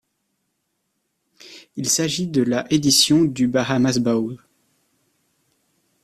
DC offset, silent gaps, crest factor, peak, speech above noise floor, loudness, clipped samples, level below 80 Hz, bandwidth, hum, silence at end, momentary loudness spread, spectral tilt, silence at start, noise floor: under 0.1%; none; 20 dB; -2 dBFS; 55 dB; -19 LUFS; under 0.1%; -58 dBFS; 15 kHz; none; 1.7 s; 13 LU; -3.5 dB/octave; 1.45 s; -73 dBFS